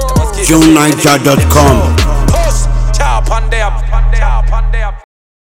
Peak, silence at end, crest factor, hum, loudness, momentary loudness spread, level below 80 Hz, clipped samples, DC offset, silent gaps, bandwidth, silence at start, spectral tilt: 0 dBFS; 0.4 s; 8 dB; none; -10 LUFS; 8 LU; -12 dBFS; 2%; under 0.1%; none; 16.5 kHz; 0 s; -5 dB/octave